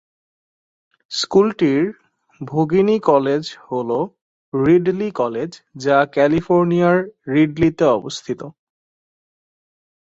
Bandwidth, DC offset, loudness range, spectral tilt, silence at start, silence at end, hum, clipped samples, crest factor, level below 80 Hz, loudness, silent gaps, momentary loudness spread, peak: 7.8 kHz; under 0.1%; 2 LU; -6.5 dB/octave; 1.1 s; 1.65 s; none; under 0.1%; 16 dB; -54 dBFS; -18 LUFS; 4.21-4.52 s; 12 LU; -2 dBFS